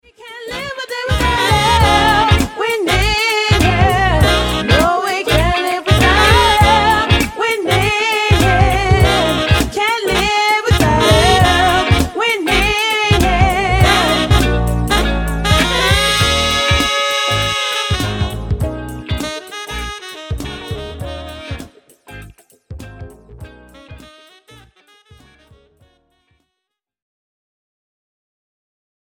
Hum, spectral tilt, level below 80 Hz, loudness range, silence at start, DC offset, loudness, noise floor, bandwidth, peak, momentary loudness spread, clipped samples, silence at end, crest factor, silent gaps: none; -4.5 dB/octave; -24 dBFS; 14 LU; 0.2 s; under 0.1%; -13 LUFS; -79 dBFS; 17.5 kHz; 0 dBFS; 15 LU; under 0.1%; 5 s; 14 dB; none